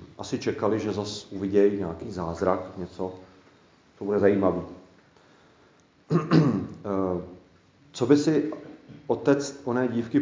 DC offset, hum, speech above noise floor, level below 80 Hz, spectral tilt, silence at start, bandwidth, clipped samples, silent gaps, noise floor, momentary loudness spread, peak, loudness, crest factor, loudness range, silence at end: under 0.1%; none; 34 dB; -54 dBFS; -7 dB/octave; 0 s; 7.6 kHz; under 0.1%; none; -59 dBFS; 15 LU; -6 dBFS; -26 LUFS; 20 dB; 3 LU; 0 s